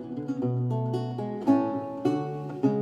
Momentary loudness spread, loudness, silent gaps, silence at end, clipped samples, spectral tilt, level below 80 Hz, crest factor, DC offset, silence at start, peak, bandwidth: 7 LU; -28 LUFS; none; 0 s; under 0.1%; -9.5 dB/octave; -68 dBFS; 18 dB; under 0.1%; 0 s; -10 dBFS; 7.8 kHz